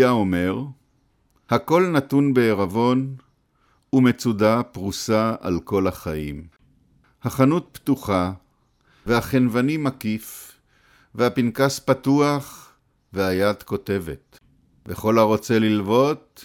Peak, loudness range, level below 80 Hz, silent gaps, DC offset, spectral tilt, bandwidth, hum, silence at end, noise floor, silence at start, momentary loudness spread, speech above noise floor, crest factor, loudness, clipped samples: -4 dBFS; 4 LU; -50 dBFS; none; under 0.1%; -6.5 dB/octave; 17.5 kHz; none; 0 s; -64 dBFS; 0 s; 15 LU; 43 dB; 18 dB; -21 LUFS; under 0.1%